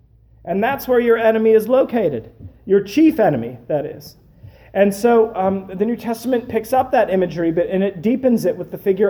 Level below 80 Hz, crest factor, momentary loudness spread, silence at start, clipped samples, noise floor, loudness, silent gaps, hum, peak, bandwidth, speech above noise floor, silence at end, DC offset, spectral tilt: -50 dBFS; 14 dB; 9 LU; 0.45 s; under 0.1%; -43 dBFS; -17 LUFS; none; none; -2 dBFS; over 20 kHz; 26 dB; 0 s; under 0.1%; -7 dB/octave